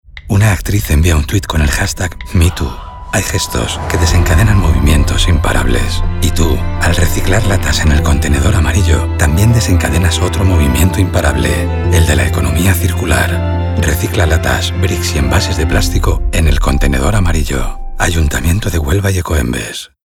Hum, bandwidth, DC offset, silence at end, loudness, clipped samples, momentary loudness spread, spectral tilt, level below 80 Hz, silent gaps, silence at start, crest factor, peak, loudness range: none; 17 kHz; under 0.1%; 0.2 s; -13 LUFS; under 0.1%; 5 LU; -5 dB/octave; -16 dBFS; none; 0.1 s; 12 dB; 0 dBFS; 2 LU